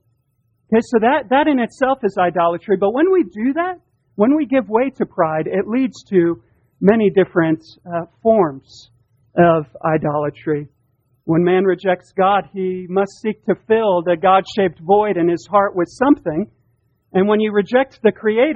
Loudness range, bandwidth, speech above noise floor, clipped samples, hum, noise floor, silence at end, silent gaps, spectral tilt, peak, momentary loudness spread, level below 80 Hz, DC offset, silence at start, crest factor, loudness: 2 LU; 8.6 kHz; 48 dB; under 0.1%; none; -65 dBFS; 0 s; none; -7.5 dB/octave; 0 dBFS; 9 LU; -56 dBFS; under 0.1%; 0.7 s; 18 dB; -17 LUFS